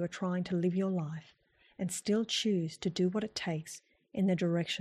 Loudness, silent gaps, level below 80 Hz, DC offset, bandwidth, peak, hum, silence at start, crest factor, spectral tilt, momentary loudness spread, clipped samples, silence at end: -33 LUFS; none; -72 dBFS; under 0.1%; 13 kHz; -20 dBFS; none; 0 s; 14 dB; -5.5 dB/octave; 11 LU; under 0.1%; 0 s